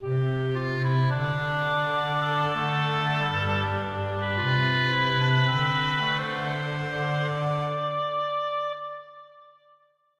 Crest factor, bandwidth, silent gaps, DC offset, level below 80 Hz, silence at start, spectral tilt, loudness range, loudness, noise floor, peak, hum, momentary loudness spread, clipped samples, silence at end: 16 dB; 7.8 kHz; none; under 0.1%; -56 dBFS; 0 s; -6.5 dB/octave; 5 LU; -26 LUFS; -62 dBFS; -10 dBFS; none; 6 LU; under 0.1%; 0.75 s